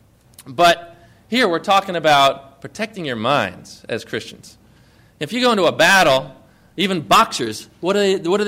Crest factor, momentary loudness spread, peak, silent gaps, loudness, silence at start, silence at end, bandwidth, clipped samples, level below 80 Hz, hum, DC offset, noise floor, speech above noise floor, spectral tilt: 16 dB; 17 LU; -2 dBFS; none; -17 LUFS; 0.4 s; 0 s; 16 kHz; under 0.1%; -54 dBFS; none; under 0.1%; -51 dBFS; 33 dB; -3.5 dB/octave